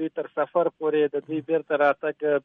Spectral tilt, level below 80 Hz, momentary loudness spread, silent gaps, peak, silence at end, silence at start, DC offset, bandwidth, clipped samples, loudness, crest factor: -8.5 dB/octave; -80 dBFS; 7 LU; none; -8 dBFS; 0.05 s; 0 s; under 0.1%; 4.2 kHz; under 0.1%; -25 LUFS; 16 dB